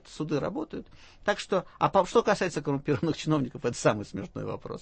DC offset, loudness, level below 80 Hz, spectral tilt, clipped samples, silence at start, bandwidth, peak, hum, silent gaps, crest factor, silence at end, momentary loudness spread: under 0.1%; -29 LUFS; -56 dBFS; -5.5 dB/octave; under 0.1%; 0.05 s; 8.8 kHz; -10 dBFS; none; none; 18 dB; 0 s; 12 LU